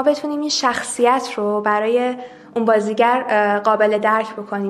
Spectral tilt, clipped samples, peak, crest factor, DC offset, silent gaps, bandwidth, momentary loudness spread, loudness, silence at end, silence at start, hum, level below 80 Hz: -3.5 dB/octave; under 0.1%; -2 dBFS; 16 dB; under 0.1%; none; 13 kHz; 6 LU; -18 LUFS; 0 s; 0 s; none; -66 dBFS